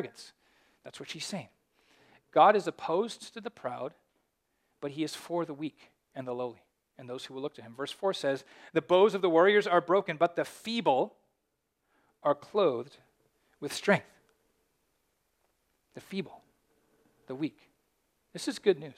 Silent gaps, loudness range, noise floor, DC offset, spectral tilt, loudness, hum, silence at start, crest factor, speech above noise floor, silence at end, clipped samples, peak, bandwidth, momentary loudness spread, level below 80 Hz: none; 15 LU; -81 dBFS; under 0.1%; -5 dB/octave; -30 LUFS; none; 0 s; 24 dB; 51 dB; 0.05 s; under 0.1%; -8 dBFS; 15 kHz; 19 LU; -82 dBFS